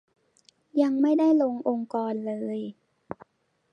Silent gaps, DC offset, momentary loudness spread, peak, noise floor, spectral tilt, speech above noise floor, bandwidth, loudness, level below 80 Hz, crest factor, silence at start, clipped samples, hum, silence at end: none; under 0.1%; 22 LU; -10 dBFS; -63 dBFS; -8 dB/octave; 39 dB; 7 kHz; -26 LUFS; -76 dBFS; 18 dB; 0.75 s; under 0.1%; none; 0.6 s